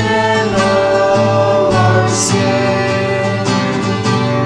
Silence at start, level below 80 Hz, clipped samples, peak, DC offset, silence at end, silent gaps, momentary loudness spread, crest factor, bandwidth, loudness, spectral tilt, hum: 0 s; -42 dBFS; under 0.1%; 0 dBFS; under 0.1%; 0 s; none; 4 LU; 12 dB; 10.5 kHz; -13 LUFS; -5 dB/octave; none